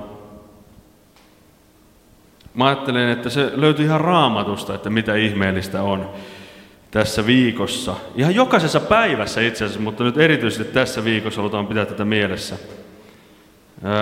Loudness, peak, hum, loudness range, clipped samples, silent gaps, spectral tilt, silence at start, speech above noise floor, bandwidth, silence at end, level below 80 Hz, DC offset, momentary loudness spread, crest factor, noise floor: -19 LUFS; 0 dBFS; none; 5 LU; under 0.1%; none; -5.5 dB/octave; 0 s; 33 dB; 16.5 kHz; 0 s; -50 dBFS; under 0.1%; 11 LU; 20 dB; -52 dBFS